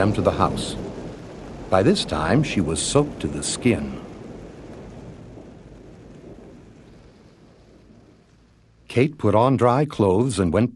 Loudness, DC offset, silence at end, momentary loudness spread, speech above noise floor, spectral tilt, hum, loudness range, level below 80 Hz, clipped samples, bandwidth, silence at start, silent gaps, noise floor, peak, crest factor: -21 LUFS; under 0.1%; 0 s; 23 LU; 35 dB; -5.5 dB/octave; none; 21 LU; -44 dBFS; under 0.1%; 12 kHz; 0 s; none; -55 dBFS; -2 dBFS; 20 dB